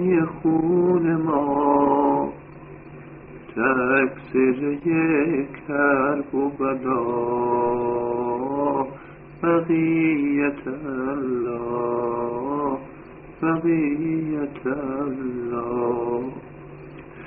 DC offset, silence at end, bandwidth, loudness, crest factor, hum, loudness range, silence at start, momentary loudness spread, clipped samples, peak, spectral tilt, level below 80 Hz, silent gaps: under 0.1%; 0 s; 3.8 kHz; -23 LUFS; 16 dB; none; 4 LU; 0 s; 21 LU; under 0.1%; -6 dBFS; -7.5 dB/octave; -54 dBFS; none